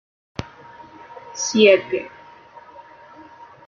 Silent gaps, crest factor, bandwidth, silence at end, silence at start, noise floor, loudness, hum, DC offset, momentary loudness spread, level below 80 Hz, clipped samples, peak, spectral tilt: none; 22 dB; 7.4 kHz; 1.6 s; 0.4 s; -45 dBFS; -17 LUFS; none; under 0.1%; 27 LU; -58 dBFS; under 0.1%; -2 dBFS; -3 dB/octave